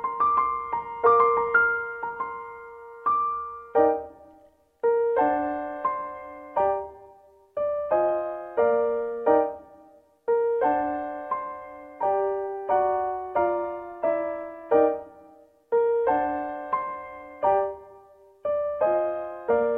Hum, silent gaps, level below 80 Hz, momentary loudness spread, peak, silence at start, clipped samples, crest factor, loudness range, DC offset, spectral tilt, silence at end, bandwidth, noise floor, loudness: none; none; -60 dBFS; 13 LU; -8 dBFS; 0 s; under 0.1%; 18 dB; 3 LU; under 0.1%; -8.5 dB/octave; 0 s; 3.8 kHz; -57 dBFS; -25 LUFS